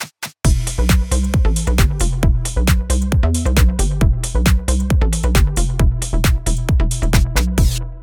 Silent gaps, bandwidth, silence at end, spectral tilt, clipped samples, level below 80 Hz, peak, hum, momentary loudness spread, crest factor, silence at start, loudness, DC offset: none; 19.5 kHz; 0 s; -5 dB/octave; under 0.1%; -16 dBFS; -2 dBFS; none; 2 LU; 14 dB; 0 s; -17 LUFS; under 0.1%